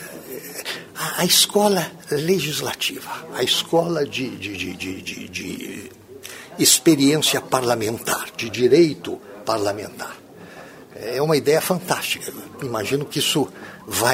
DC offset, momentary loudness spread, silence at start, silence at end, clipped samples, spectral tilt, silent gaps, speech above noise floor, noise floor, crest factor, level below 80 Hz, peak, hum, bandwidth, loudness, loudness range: under 0.1%; 19 LU; 0 s; 0 s; under 0.1%; -3 dB/octave; none; 20 dB; -41 dBFS; 22 dB; -60 dBFS; 0 dBFS; none; 16.5 kHz; -20 LUFS; 6 LU